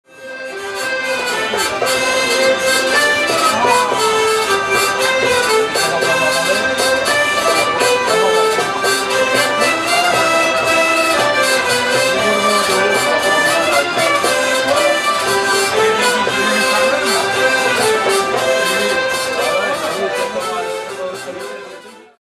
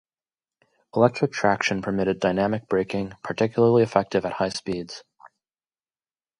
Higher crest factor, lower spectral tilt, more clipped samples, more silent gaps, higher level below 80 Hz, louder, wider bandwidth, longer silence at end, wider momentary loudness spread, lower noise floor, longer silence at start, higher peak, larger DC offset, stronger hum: second, 14 dB vs 22 dB; second, -1.5 dB/octave vs -6 dB/octave; neither; neither; first, -52 dBFS vs -58 dBFS; first, -14 LUFS vs -23 LUFS; first, 15 kHz vs 11 kHz; second, 0.25 s vs 1.1 s; second, 7 LU vs 12 LU; second, -36 dBFS vs under -90 dBFS; second, 0.15 s vs 0.95 s; about the same, 0 dBFS vs -2 dBFS; neither; neither